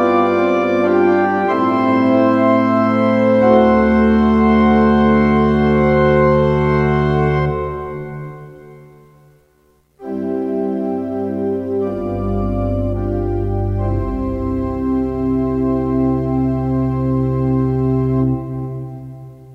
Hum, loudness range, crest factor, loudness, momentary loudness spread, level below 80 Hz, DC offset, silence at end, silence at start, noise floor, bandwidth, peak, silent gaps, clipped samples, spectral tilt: none; 10 LU; 16 dB; -16 LUFS; 12 LU; -30 dBFS; under 0.1%; 0 s; 0 s; -56 dBFS; 6.2 kHz; 0 dBFS; none; under 0.1%; -9.5 dB/octave